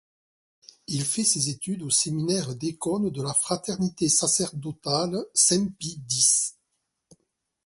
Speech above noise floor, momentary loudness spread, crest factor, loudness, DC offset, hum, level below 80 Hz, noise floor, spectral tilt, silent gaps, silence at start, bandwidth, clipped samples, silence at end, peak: 52 dB; 11 LU; 22 dB; -24 LUFS; under 0.1%; none; -64 dBFS; -78 dBFS; -3 dB/octave; none; 0.9 s; 12 kHz; under 0.1%; 1.15 s; -6 dBFS